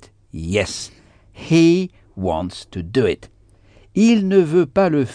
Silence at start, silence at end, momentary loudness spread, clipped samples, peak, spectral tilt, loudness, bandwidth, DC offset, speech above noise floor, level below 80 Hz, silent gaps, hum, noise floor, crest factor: 0.35 s; 0 s; 17 LU; under 0.1%; -2 dBFS; -6 dB/octave; -18 LUFS; 10 kHz; under 0.1%; 33 dB; -46 dBFS; none; none; -50 dBFS; 16 dB